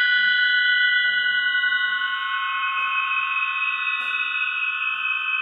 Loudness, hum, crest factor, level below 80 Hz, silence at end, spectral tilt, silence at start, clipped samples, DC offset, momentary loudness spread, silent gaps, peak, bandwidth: -20 LUFS; none; 14 dB; -88 dBFS; 0 s; 0.5 dB/octave; 0 s; under 0.1%; under 0.1%; 6 LU; none; -8 dBFS; 5.2 kHz